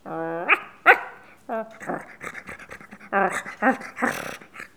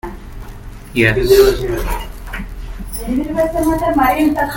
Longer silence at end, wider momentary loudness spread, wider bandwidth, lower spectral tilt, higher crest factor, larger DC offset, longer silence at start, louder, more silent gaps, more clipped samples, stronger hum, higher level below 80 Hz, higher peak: about the same, 0.1 s vs 0 s; about the same, 22 LU vs 23 LU; first, over 20 kHz vs 17 kHz; second, -4 dB/octave vs -5.5 dB/octave; first, 26 dB vs 16 dB; first, 0.1% vs under 0.1%; about the same, 0.05 s vs 0.05 s; second, -23 LUFS vs -15 LUFS; neither; neither; neither; second, -66 dBFS vs -26 dBFS; about the same, 0 dBFS vs 0 dBFS